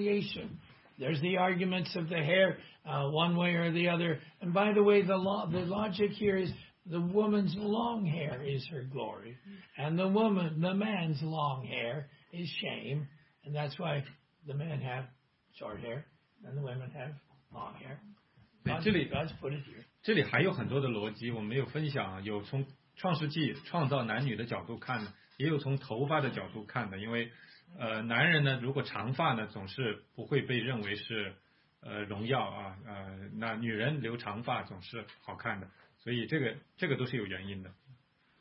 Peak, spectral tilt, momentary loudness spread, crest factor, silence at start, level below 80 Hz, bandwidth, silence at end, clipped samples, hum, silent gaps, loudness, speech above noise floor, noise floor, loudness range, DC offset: -12 dBFS; -4.5 dB/octave; 16 LU; 22 dB; 0 s; -68 dBFS; 5.6 kHz; 0.45 s; under 0.1%; none; none; -34 LUFS; 32 dB; -65 dBFS; 9 LU; under 0.1%